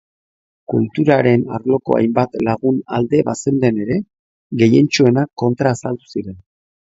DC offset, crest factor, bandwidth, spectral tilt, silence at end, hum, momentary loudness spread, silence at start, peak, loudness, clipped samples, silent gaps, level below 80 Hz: under 0.1%; 16 dB; 8 kHz; -6.5 dB/octave; 0.5 s; none; 12 LU; 0.7 s; 0 dBFS; -16 LUFS; under 0.1%; 4.19-4.50 s; -52 dBFS